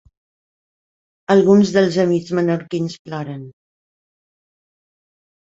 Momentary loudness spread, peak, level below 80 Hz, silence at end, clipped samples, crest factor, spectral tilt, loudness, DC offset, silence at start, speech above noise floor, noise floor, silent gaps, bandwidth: 17 LU; -2 dBFS; -60 dBFS; 2.1 s; under 0.1%; 18 dB; -7 dB/octave; -16 LUFS; under 0.1%; 1.3 s; over 74 dB; under -90 dBFS; 2.99-3.05 s; 7.8 kHz